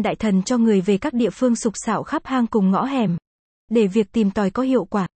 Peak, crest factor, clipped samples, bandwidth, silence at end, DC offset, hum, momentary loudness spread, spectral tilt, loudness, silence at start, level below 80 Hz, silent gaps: -6 dBFS; 14 dB; under 0.1%; 8.8 kHz; 0.1 s; under 0.1%; none; 5 LU; -6.5 dB/octave; -20 LUFS; 0 s; -52 dBFS; 3.27-3.68 s